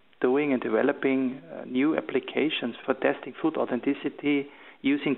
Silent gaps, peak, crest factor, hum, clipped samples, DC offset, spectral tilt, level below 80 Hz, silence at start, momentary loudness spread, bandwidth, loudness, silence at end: none; -8 dBFS; 18 dB; none; under 0.1%; under 0.1%; -9.5 dB/octave; -72 dBFS; 0.2 s; 6 LU; 4.1 kHz; -27 LUFS; 0 s